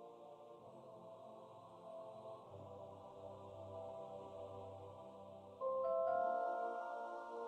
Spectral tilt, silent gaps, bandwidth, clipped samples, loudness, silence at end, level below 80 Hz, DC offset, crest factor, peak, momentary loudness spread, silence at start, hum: -7 dB/octave; none; 9 kHz; under 0.1%; -46 LUFS; 0 s; -84 dBFS; under 0.1%; 18 dB; -28 dBFS; 19 LU; 0 s; none